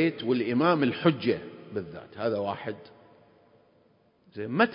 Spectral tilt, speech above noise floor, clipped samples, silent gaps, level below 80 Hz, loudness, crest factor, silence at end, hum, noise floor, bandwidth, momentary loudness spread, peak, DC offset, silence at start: -10.5 dB/octave; 37 dB; under 0.1%; none; -66 dBFS; -28 LUFS; 20 dB; 0 s; none; -64 dBFS; 5.4 kHz; 15 LU; -10 dBFS; under 0.1%; 0 s